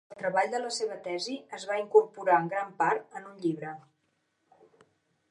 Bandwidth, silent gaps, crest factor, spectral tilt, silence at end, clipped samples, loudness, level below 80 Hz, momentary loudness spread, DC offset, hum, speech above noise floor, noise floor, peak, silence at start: 11 kHz; none; 22 dB; -4 dB/octave; 1.5 s; under 0.1%; -29 LUFS; -86 dBFS; 14 LU; under 0.1%; none; 46 dB; -76 dBFS; -8 dBFS; 0.1 s